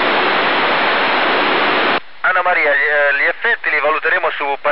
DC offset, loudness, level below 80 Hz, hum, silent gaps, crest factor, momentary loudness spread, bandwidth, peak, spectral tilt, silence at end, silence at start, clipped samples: 3%; -14 LUFS; -66 dBFS; none; none; 12 dB; 4 LU; 5.8 kHz; -2 dBFS; 1 dB/octave; 0 s; 0 s; under 0.1%